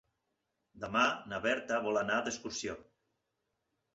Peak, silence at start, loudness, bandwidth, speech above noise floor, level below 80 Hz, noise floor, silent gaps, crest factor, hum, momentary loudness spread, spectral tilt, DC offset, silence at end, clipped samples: -14 dBFS; 0.75 s; -34 LUFS; 8.2 kHz; 50 dB; -68 dBFS; -84 dBFS; none; 22 dB; none; 12 LU; -3 dB/octave; under 0.1%; 1.15 s; under 0.1%